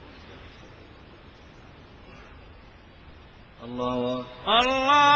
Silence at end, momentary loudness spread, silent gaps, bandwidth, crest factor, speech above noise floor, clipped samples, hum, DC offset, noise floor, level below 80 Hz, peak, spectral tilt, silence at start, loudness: 0 s; 28 LU; none; 8.2 kHz; 20 dB; 27 dB; under 0.1%; none; under 0.1%; -49 dBFS; -52 dBFS; -8 dBFS; -3.5 dB/octave; 0.15 s; -24 LUFS